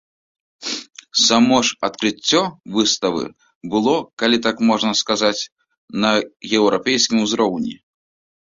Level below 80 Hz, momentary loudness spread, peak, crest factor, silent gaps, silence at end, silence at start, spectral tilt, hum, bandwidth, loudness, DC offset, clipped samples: -58 dBFS; 12 LU; -2 dBFS; 18 dB; 3.55-3.61 s, 4.13-4.17 s, 5.52-5.56 s, 5.78-5.88 s; 0.75 s; 0.6 s; -3 dB/octave; none; 7.8 kHz; -18 LUFS; under 0.1%; under 0.1%